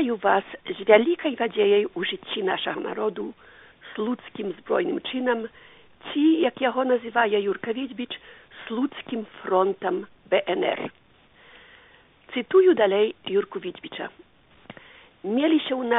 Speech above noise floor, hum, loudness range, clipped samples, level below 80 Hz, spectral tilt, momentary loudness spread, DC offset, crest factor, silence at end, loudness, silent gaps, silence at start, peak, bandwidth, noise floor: 31 dB; none; 5 LU; under 0.1%; -68 dBFS; -2.5 dB/octave; 16 LU; under 0.1%; 24 dB; 0 s; -24 LUFS; none; 0 s; -2 dBFS; 4 kHz; -55 dBFS